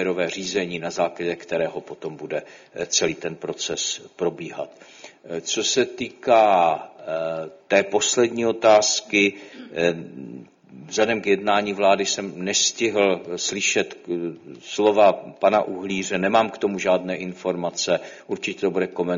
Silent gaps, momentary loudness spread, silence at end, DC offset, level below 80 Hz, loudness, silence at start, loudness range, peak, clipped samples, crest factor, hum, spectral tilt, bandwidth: none; 15 LU; 0 s; under 0.1%; -64 dBFS; -22 LUFS; 0 s; 6 LU; -4 dBFS; under 0.1%; 18 dB; none; -3 dB/octave; 7.6 kHz